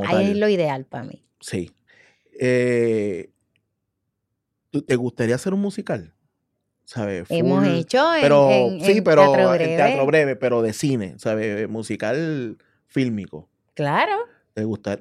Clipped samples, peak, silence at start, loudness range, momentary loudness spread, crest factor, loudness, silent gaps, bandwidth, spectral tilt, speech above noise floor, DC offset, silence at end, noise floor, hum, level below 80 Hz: under 0.1%; 0 dBFS; 0 s; 10 LU; 16 LU; 20 dB; -20 LUFS; none; 14 kHz; -6 dB/octave; 58 dB; under 0.1%; 0.05 s; -78 dBFS; none; -64 dBFS